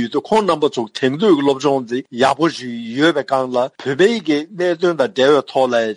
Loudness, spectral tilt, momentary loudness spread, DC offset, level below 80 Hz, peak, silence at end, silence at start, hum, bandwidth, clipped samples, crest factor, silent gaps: -17 LUFS; -5 dB/octave; 6 LU; under 0.1%; -62 dBFS; -2 dBFS; 0 s; 0 s; none; 11.5 kHz; under 0.1%; 14 dB; none